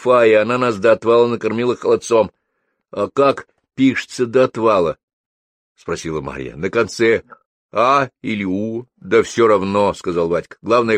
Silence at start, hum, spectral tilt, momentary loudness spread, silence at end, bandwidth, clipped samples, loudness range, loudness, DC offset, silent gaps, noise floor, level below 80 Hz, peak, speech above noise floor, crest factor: 0 s; none; -5.5 dB/octave; 12 LU; 0 s; 10 kHz; under 0.1%; 3 LU; -17 LUFS; under 0.1%; 5.03-5.75 s, 7.46-7.69 s; -71 dBFS; -52 dBFS; -2 dBFS; 55 dB; 16 dB